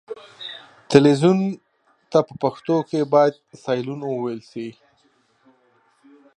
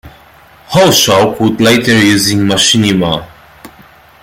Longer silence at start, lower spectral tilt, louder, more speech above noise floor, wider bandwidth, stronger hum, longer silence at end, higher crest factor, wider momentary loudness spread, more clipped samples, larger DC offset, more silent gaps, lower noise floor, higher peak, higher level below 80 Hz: about the same, 0.1 s vs 0.05 s; first, -7 dB/octave vs -3.5 dB/octave; second, -20 LUFS vs -9 LUFS; first, 43 dB vs 32 dB; second, 11 kHz vs 17 kHz; neither; first, 1.65 s vs 0.55 s; first, 22 dB vs 12 dB; first, 19 LU vs 7 LU; neither; neither; neither; first, -62 dBFS vs -41 dBFS; about the same, 0 dBFS vs 0 dBFS; second, -68 dBFS vs -42 dBFS